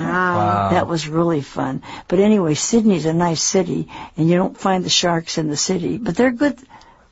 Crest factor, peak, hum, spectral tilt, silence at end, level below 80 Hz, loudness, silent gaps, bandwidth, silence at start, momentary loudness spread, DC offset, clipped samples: 14 dB; -4 dBFS; none; -4.5 dB/octave; 0.35 s; -48 dBFS; -18 LUFS; none; 8 kHz; 0 s; 8 LU; under 0.1%; under 0.1%